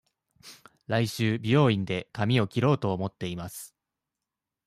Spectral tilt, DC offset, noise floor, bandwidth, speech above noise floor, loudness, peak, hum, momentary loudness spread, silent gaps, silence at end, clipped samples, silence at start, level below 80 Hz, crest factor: -6.5 dB/octave; under 0.1%; -88 dBFS; 15 kHz; 62 dB; -27 LUFS; -10 dBFS; none; 14 LU; none; 1 s; under 0.1%; 0.45 s; -62 dBFS; 18 dB